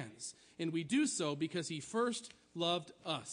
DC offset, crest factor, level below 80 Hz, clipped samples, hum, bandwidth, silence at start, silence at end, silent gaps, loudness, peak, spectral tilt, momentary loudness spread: under 0.1%; 18 dB; -80 dBFS; under 0.1%; none; 10.5 kHz; 0 s; 0 s; none; -38 LUFS; -20 dBFS; -4 dB/octave; 12 LU